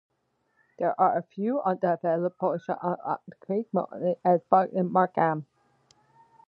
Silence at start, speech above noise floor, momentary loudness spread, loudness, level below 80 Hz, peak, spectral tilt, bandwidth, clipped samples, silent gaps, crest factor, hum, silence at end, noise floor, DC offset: 0.8 s; 47 dB; 9 LU; -27 LUFS; -80 dBFS; -6 dBFS; -10 dB/octave; 5.2 kHz; under 0.1%; none; 20 dB; none; 1.05 s; -73 dBFS; under 0.1%